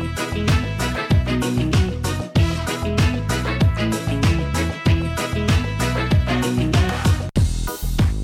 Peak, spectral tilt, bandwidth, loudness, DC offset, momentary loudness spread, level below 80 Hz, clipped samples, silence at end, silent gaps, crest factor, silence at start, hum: -8 dBFS; -5.5 dB/octave; 17 kHz; -20 LUFS; under 0.1%; 4 LU; -28 dBFS; under 0.1%; 0 s; none; 10 dB; 0 s; none